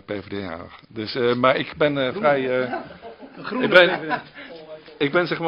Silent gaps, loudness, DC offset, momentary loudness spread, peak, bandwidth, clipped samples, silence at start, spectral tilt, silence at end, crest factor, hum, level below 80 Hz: none; -21 LUFS; under 0.1%; 24 LU; 0 dBFS; 5.8 kHz; under 0.1%; 0.1 s; -7 dB/octave; 0 s; 22 dB; none; -60 dBFS